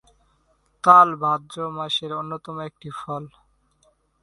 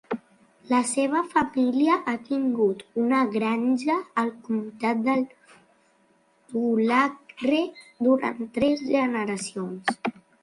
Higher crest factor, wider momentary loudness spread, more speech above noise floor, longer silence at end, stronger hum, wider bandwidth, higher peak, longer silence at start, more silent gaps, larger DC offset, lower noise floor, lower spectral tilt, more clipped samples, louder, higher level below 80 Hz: about the same, 22 dB vs 18 dB; first, 21 LU vs 8 LU; first, 44 dB vs 39 dB; first, 0.95 s vs 0.3 s; neither; about the same, 11.5 kHz vs 11.5 kHz; first, 0 dBFS vs -8 dBFS; first, 0.85 s vs 0.1 s; neither; neither; about the same, -65 dBFS vs -63 dBFS; about the same, -5 dB/octave vs -4.5 dB/octave; neither; first, -20 LUFS vs -25 LUFS; about the same, -64 dBFS vs -66 dBFS